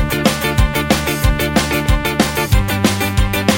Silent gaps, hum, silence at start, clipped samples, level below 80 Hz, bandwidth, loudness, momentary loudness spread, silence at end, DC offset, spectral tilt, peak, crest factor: none; none; 0 s; under 0.1%; -20 dBFS; 17 kHz; -16 LUFS; 1 LU; 0 s; under 0.1%; -4.5 dB/octave; 0 dBFS; 14 dB